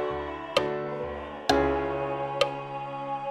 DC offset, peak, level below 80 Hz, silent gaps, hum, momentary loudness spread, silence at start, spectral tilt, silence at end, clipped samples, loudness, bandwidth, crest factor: under 0.1%; -8 dBFS; -48 dBFS; none; none; 10 LU; 0 s; -5 dB/octave; 0 s; under 0.1%; -29 LUFS; 16 kHz; 22 dB